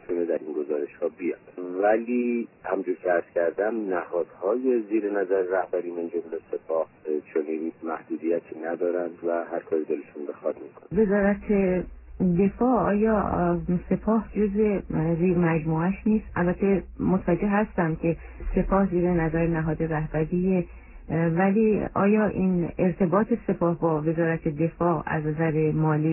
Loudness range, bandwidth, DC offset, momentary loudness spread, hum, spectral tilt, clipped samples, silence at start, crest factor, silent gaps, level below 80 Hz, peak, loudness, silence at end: 5 LU; 3 kHz; under 0.1%; 9 LU; none; -13 dB/octave; under 0.1%; 0.1 s; 16 dB; none; -44 dBFS; -8 dBFS; -25 LUFS; 0 s